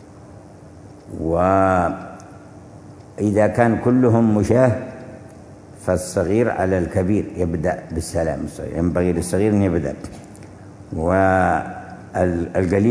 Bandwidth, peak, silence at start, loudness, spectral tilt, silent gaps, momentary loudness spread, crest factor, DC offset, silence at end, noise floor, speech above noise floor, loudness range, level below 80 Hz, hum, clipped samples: 11 kHz; 0 dBFS; 0 s; -19 LUFS; -7.5 dB/octave; none; 21 LU; 20 dB; under 0.1%; 0 s; -41 dBFS; 23 dB; 3 LU; -42 dBFS; none; under 0.1%